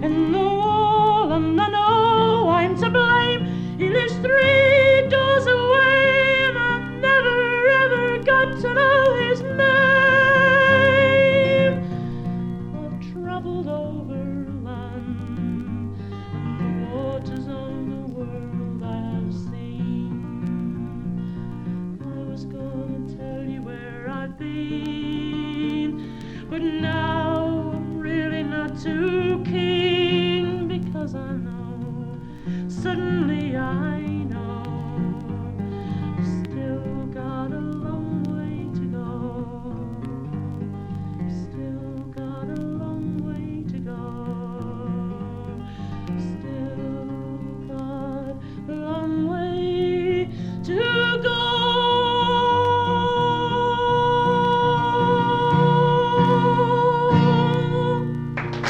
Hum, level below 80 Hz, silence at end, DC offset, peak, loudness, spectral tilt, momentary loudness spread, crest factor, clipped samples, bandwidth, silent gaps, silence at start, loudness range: none; -46 dBFS; 0 s; under 0.1%; -4 dBFS; -21 LUFS; -7 dB/octave; 16 LU; 16 dB; under 0.1%; 8.6 kHz; none; 0 s; 14 LU